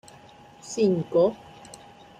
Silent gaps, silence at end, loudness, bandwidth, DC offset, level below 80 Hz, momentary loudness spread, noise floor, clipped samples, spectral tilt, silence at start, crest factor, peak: none; 0.85 s; -24 LUFS; 11 kHz; under 0.1%; -64 dBFS; 23 LU; -50 dBFS; under 0.1%; -6.5 dB/octave; 0.65 s; 16 dB; -10 dBFS